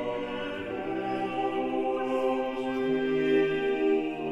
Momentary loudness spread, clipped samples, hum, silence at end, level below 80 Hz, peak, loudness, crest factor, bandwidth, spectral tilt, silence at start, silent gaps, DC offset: 8 LU; under 0.1%; none; 0 s; -58 dBFS; -14 dBFS; -29 LUFS; 14 dB; 8 kHz; -6.5 dB/octave; 0 s; none; under 0.1%